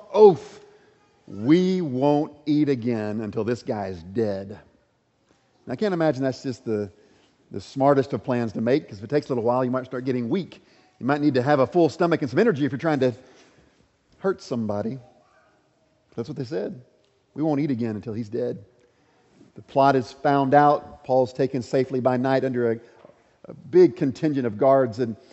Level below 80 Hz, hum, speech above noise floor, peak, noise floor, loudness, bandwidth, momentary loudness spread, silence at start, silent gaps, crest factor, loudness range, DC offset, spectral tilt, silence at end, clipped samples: -66 dBFS; none; 44 dB; -2 dBFS; -66 dBFS; -23 LUFS; 8.2 kHz; 14 LU; 0.1 s; none; 22 dB; 8 LU; under 0.1%; -7.5 dB/octave; 0.15 s; under 0.1%